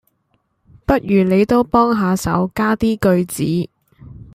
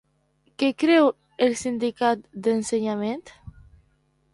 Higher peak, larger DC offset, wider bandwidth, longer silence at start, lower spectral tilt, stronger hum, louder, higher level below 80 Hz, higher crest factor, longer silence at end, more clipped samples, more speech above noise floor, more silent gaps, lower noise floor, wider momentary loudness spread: first, -2 dBFS vs -6 dBFS; neither; first, 15.5 kHz vs 11.5 kHz; first, 0.9 s vs 0.6 s; first, -6.5 dB/octave vs -4.5 dB/octave; neither; first, -16 LUFS vs -23 LUFS; first, -40 dBFS vs -58 dBFS; about the same, 16 dB vs 18 dB; second, 0.1 s vs 0.85 s; neither; first, 50 dB vs 43 dB; neither; about the same, -65 dBFS vs -66 dBFS; second, 6 LU vs 9 LU